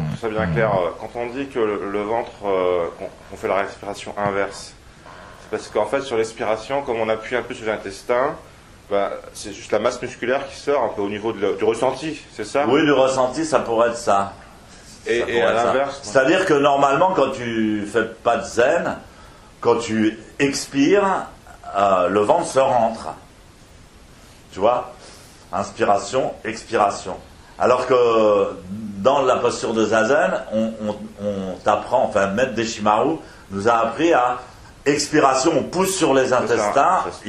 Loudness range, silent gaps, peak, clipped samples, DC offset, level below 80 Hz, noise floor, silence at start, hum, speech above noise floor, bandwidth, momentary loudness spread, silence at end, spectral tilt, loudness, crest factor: 6 LU; none; 0 dBFS; under 0.1%; under 0.1%; -50 dBFS; -46 dBFS; 0 s; none; 26 dB; 14.5 kHz; 13 LU; 0 s; -4.5 dB/octave; -20 LUFS; 20 dB